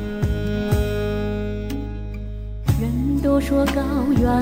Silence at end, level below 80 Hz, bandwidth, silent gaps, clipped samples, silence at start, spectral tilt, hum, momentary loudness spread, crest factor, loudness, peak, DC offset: 0 s; -28 dBFS; 16 kHz; none; under 0.1%; 0 s; -7.5 dB/octave; none; 12 LU; 14 dB; -22 LUFS; -6 dBFS; under 0.1%